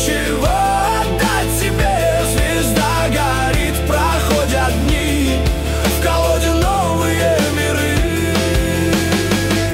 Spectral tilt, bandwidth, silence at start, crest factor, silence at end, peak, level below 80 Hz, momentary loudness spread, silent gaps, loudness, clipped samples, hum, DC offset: -4.5 dB/octave; 16.5 kHz; 0 s; 12 dB; 0 s; -4 dBFS; -22 dBFS; 2 LU; none; -16 LUFS; under 0.1%; none; under 0.1%